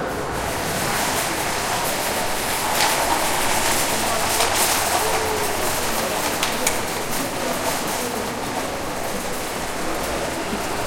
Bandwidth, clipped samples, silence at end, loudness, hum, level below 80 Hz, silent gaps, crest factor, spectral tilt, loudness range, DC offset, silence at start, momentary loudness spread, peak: 16.5 kHz; under 0.1%; 0 s; -21 LUFS; none; -40 dBFS; none; 22 dB; -2 dB/octave; 5 LU; under 0.1%; 0 s; 7 LU; 0 dBFS